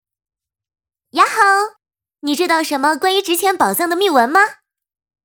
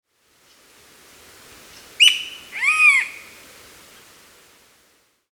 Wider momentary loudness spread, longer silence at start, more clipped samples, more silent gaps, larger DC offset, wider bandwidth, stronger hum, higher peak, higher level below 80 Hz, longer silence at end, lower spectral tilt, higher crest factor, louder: second, 9 LU vs 18 LU; second, 1.15 s vs 2 s; neither; neither; neither; about the same, over 20 kHz vs over 20 kHz; neither; about the same, 0 dBFS vs 0 dBFS; about the same, -66 dBFS vs -68 dBFS; second, 0.7 s vs 2.1 s; first, -2 dB/octave vs 3 dB/octave; second, 18 dB vs 24 dB; about the same, -15 LUFS vs -15 LUFS